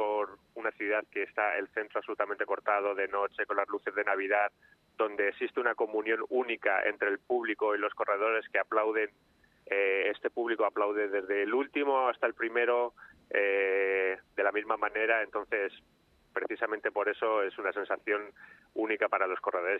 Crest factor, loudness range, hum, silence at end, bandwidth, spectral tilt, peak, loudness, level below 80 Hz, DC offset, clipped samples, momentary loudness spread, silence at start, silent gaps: 18 dB; 3 LU; none; 0 s; 4.2 kHz; -5.5 dB/octave; -12 dBFS; -31 LUFS; -76 dBFS; under 0.1%; under 0.1%; 6 LU; 0 s; none